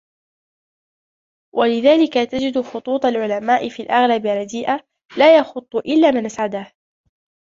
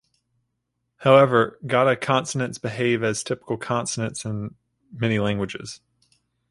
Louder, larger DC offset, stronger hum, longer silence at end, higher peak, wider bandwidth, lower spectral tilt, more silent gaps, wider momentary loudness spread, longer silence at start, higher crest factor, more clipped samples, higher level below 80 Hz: first, -17 LUFS vs -22 LUFS; neither; second, none vs 60 Hz at -45 dBFS; first, 0.9 s vs 0.75 s; about the same, -2 dBFS vs -2 dBFS; second, 7.6 kHz vs 11.5 kHz; about the same, -4.5 dB/octave vs -5 dB/octave; first, 5.05-5.09 s vs none; second, 11 LU vs 15 LU; first, 1.55 s vs 1 s; second, 16 dB vs 22 dB; neither; about the same, -62 dBFS vs -58 dBFS